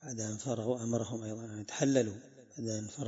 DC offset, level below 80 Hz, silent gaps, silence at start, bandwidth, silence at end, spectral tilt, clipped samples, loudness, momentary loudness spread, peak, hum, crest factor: under 0.1%; -74 dBFS; none; 0 s; 7.6 kHz; 0 s; -6.5 dB/octave; under 0.1%; -35 LUFS; 12 LU; -14 dBFS; none; 22 dB